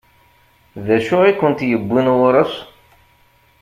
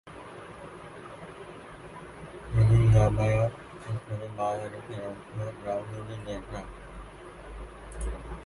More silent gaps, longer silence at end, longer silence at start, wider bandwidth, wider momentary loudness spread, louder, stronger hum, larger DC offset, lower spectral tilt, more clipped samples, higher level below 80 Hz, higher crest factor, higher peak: neither; first, 0.95 s vs 0 s; first, 0.75 s vs 0.05 s; first, 15 kHz vs 11.5 kHz; second, 9 LU vs 22 LU; first, -15 LUFS vs -29 LUFS; neither; neither; about the same, -7.5 dB/octave vs -7.5 dB/octave; neither; second, -54 dBFS vs -42 dBFS; about the same, 16 dB vs 20 dB; first, -2 dBFS vs -10 dBFS